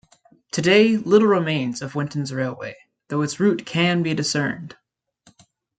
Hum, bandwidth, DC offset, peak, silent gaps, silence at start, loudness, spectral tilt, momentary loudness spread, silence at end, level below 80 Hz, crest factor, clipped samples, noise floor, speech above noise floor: none; 9.4 kHz; under 0.1%; -2 dBFS; none; 0.55 s; -20 LUFS; -5 dB/octave; 13 LU; 1.1 s; -64 dBFS; 20 dB; under 0.1%; -59 dBFS; 38 dB